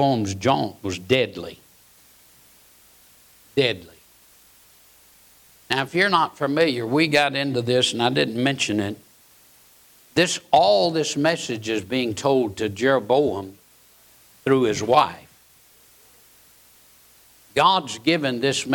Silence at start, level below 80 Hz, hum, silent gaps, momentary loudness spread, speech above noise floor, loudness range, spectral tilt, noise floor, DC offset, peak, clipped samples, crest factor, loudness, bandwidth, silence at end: 0 s; -62 dBFS; none; none; 9 LU; 33 dB; 9 LU; -4.5 dB/octave; -54 dBFS; under 0.1%; -6 dBFS; under 0.1%; 18 dB; -21 LUFS; 19 kHz; 0 s